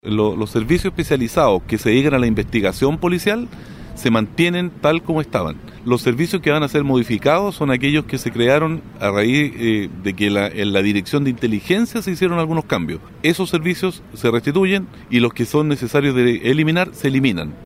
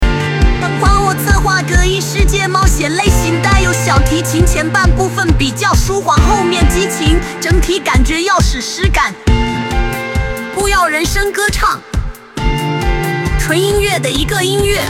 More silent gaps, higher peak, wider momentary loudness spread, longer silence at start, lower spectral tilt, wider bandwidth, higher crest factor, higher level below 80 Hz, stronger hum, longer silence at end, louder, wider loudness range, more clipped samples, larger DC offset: neither; about the same, -2 dBFS vs 0 dBFS; about the same, 6 LU vs 5 LU; about the same, 0.05 s vs 0 s; first, -6 dB/octave vs -4.5 dB/octave; about the same, 16 kHz vs 16.5 kHz; about the same, 16 dB vs 12 dB; second, -40 dBFS vs -16 dBFS; neither; about the same, 0 s vs 0 s; second, -18 LUFS vs -13 LUFS; about the same, 2 LU vs 3 LU; neither; second, under 0.1% vs 0.3%